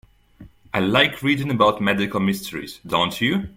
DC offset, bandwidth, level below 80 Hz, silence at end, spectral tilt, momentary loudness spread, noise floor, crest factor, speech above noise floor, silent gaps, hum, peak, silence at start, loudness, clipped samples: under 0.1%; 16.5 kHz; -52 dBFS; 0.05 s; -5 dB/octave; 10 LU; -47 dBFS; 20 dB; 26 dB; none; none; 0 dBFS; 0.4 s; -20 LUFS; under 0.1%